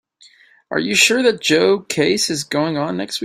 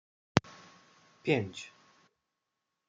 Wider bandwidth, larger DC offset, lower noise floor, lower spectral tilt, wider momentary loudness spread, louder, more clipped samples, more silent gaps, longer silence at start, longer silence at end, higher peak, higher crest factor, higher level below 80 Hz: first, 16 kHz vs 9.4 kHz; neither; second, -50 dBFS vs -85 dBFS; second, -3 dB/octave vs -5.5 dB/octave; second, 9 LU vs 21 LU; first, -16 LUFS vs -33 LUFS; neither; neither; first, 0.7 s vs 0.35 s; second, 0 s vs 1.2 s; first, 0 dBFS vs -4 dBFS; second, 18 dB vs 34 dB; first, -60 dBFS vs -66 dBFS